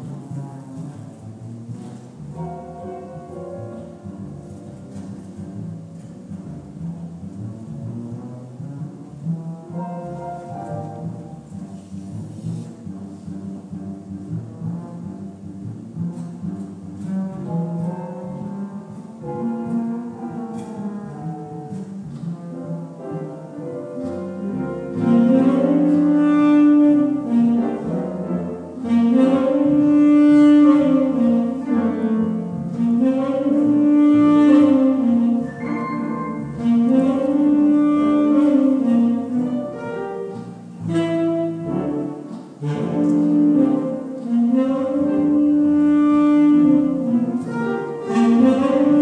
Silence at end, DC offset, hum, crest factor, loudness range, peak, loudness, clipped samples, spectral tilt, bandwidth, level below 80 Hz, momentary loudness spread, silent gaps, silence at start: 0 s; under 0.1%; none; 16 dB; 18 LU; -4 dBFS; -18 LUFS; under 0.1%; -8.5 dB/octave; 9 kHz; -58 dBFS; 20 LU; none; 0 s